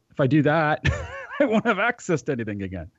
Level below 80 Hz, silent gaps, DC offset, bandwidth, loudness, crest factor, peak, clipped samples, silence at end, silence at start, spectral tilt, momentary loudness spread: -42 dBFS; none; under 0.1%; 8 kHz; -23 LUFS; 14 dB; -10 dBFS; under 0.1%; 0.1 s; 0.2 s; -6.5 dB/octave; 12 LU